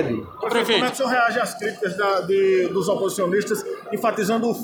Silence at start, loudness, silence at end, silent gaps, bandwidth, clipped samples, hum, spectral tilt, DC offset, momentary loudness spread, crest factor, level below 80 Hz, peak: 0 s; -21 LUFS; 0 s; none; over 20 kHz; under 0.1%; none; -4 dB/octave; under 0.1%; 7 LU; 16 dB; -64 dBFS; -6 dBFS